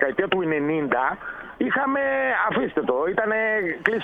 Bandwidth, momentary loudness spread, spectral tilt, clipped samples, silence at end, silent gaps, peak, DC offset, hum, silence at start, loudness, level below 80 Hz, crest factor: 7.6 kHz; 4 LU; -7.5 dB/octave; under 0.1%; 0 s; none; 0 dBFS; under 0.1%; none; 0 s; -23 LUFS; -56 dBFS; 22 dB